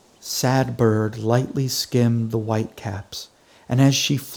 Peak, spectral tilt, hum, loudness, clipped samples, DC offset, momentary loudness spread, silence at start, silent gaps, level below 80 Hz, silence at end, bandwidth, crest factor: -4 dBFS; -5 dB/octave; none; -21 LUFS; under 0.1%; under 0.1%; 14 LU; 0.25 s; none; -56 dBFS; 0 s; over 20 kHz; 18 dB